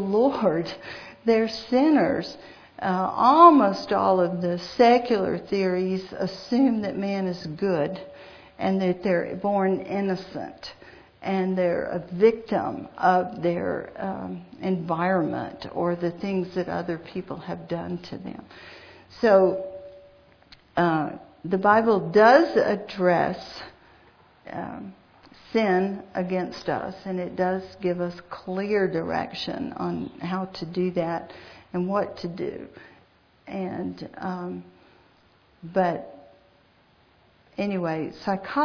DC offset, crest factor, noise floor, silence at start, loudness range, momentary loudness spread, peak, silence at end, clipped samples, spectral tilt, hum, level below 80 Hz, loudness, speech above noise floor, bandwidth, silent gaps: under 0.1%; 24 dB; -60 dBFS; 0 s; 12 LU; 18 LU; -2 dBFS; 0 s; under 0.1%; -7.5 dB/octave; none; -60 dBFS; -24 LUFS; 36 dB; 5.4 kHz; none